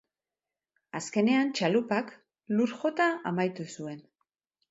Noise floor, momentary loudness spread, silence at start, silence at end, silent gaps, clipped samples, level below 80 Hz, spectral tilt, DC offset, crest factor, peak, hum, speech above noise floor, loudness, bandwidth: under -90 dBFS; 15 LU; 0.95 s; 0.7 s; none; under 0.1%; -78 dBFS; -5.5 dB/octave; under 0.1%; 18 dB; -14 dBFS; none; over 62 dB; -29 LUFS; 8.2 kHz